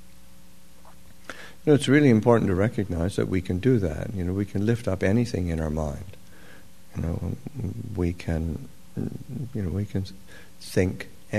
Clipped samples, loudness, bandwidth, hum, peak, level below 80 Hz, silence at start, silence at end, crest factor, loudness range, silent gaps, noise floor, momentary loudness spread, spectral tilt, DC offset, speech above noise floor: under 0.1%; -26 LUFS; 13.5 kHz; none; -4 dBFS; -44 dBFS; 0.85 s; 0 s; 22 dB; 9 LU; none; -53 dBFS; 19 LU; -7 dB/octave; 0.9%; 28 dB